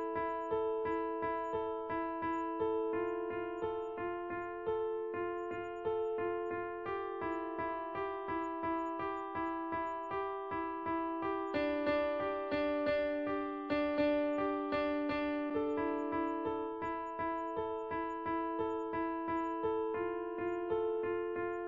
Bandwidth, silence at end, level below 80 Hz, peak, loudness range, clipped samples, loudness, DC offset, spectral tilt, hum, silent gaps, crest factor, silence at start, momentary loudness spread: 7.4 kHz; 0 s; -66 dBFS; -20 dBFS; 4 LU; under 0.1%; -37 LUFS; under 0.1%; -4 dB/octave; none; none; 16 dB; 0 s; 5 LU